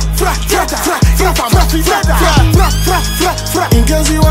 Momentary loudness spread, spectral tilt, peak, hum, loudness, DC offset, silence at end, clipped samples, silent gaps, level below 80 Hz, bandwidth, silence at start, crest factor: 4 LU; -4.5 dB/octave; 0 dBFS; none; -11 LUFS; under 0.1%; 0 s; under 0.1%; none; -14 dBFS; 16.5 kHz; 0 s; 10 dB